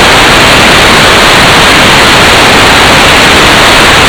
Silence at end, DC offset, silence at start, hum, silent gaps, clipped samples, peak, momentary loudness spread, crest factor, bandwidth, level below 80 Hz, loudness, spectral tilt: 0 s; under 0.1%; 0 s; none; none; 40%; 0 dBFS; 0 LU; 2 dB; over 20 kHz; -20 dBFS; -1 LUFS; -2.5 dB/octave